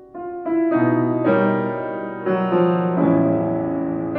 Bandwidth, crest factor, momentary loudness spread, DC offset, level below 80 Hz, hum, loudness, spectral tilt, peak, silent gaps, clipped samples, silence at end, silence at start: 4.3 kHz; 14 dB; 9 LU; under 0.1%; -58 dBFS; none; -20 LUFS; -12 dB/octave; -6 dBFS; none; under 0.1%; 0 s; 0 s